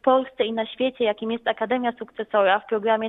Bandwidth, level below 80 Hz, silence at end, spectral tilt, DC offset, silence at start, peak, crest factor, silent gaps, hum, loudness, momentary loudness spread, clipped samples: 4 kHz; -68 dBFS; 0 s; -7.5 dB/octave; under 0.1%; 0.05 s; -6 dBFS; 18 dB; none; none; -23 LUFS; 6 LU; under 0.1%